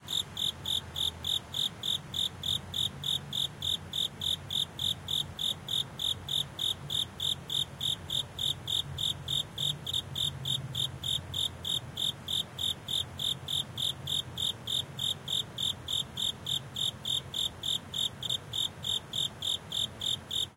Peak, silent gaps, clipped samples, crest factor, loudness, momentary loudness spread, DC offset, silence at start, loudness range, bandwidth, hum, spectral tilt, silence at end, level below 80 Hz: -18 dBFS; none; under 0.1%; 16 dB; -31 LUFS; 3 LU; under 0.1%; 0 s; 1 LU; 16.5 kHz; none; -2 dB/octave; 0 s; -60 dBFS